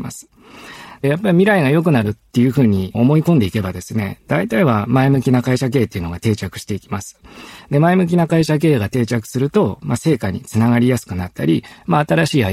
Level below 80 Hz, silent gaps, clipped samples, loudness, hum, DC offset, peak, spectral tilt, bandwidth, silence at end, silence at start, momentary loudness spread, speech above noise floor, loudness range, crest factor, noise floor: -46 dBFS; none; under 0.1%; -16 LUFS; none; under 0.1%; -2 dBFS; -7 dB/octave; 15.5 kHz; 0 s; 0 s; 11 LU; 22 dB; 3 LU; 14 dB; -37 dBFS